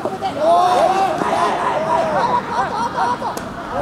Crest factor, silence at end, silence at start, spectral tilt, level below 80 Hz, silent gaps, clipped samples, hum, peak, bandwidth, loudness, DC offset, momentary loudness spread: 14 dB; 0 s; 0 s; -4.5 dB/octave; -48 dBFS; none; under 0.1%; none; -4 dBFS; 14.5 kHz; -18 LUFS; under 0.1%; 9 LU